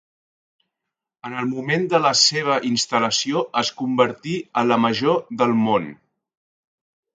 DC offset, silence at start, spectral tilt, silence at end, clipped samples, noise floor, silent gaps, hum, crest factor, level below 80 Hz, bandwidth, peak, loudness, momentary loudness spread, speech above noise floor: under 0.1%; 1.25 s; -3.5 dB/octave; 1.25 s; under 0.1%; -84 dBFS; none; none; 20 dB; -66 dBFS; 9.4 kHz; -2 dBFS; -20 LUFS; 10 LU; 64 dB